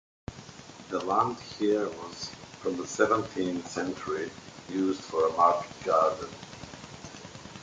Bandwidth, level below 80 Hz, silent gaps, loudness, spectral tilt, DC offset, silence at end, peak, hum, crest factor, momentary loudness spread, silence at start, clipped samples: 9.6 kHz; -60 dBFS; none; -29 LUFS; -4.5 dB/octave; under 0.1%; 0 s; -8 dBFS; none; 22 dB; 19 LU; 0.3 s; under 0.1%